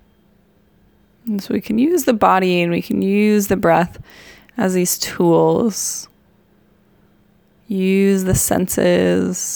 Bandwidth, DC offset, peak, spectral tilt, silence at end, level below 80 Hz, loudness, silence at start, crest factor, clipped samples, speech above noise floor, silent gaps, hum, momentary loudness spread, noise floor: over 20 kHz; under 0.1%; 0 dBFS; -5 dB/octave; 0 s; -44 dBFS; -17 LUFS; 1.25 s; 16 dB; under 0.1%; 39 dB; none; none; 10 LU; -55 dBFS